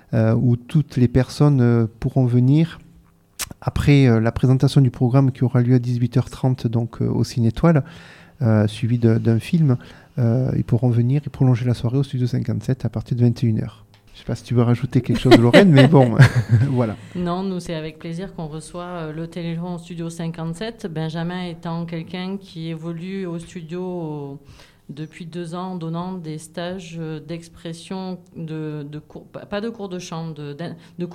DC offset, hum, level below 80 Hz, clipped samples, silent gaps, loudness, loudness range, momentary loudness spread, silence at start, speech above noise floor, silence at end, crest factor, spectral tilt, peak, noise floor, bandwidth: under 0.1%; none; -44 dBFS; under 0.1%; none; -20 LUFS; 15 LU; 17 LU; 0.1 s; 33 dB; 0 s; 20 dB; -7.5 dB/octave; 0 dBFS; -52 dBFS; 13 kHz